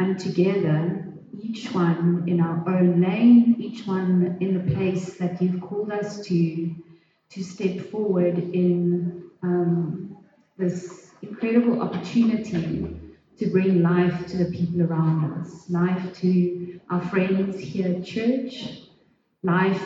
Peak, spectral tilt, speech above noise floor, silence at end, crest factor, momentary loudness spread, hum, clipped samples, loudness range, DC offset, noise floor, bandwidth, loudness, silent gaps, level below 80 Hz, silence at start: -8 dBFS; -8.5 dB/octave; 40 dB; 0 s; 16 dB; 14 LU; none; under 0.1%; 6 LU; under 0.1%; -62 dBFS; 7.6 kHz; -23 LUFS; none; -58 dBFS; 0 s